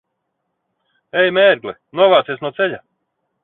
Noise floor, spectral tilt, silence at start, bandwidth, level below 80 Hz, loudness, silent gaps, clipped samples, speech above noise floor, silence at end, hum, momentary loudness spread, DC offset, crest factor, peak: -74 dBFS; -7.5 dB/octave; 1.15 s; 4.2 kHz; -66 dBFS; -15 LUFS; none; under 0.1%; 58 dB; 0.65 s; none; 12 LU; under 0.1%; 18 dB; 0 dBFS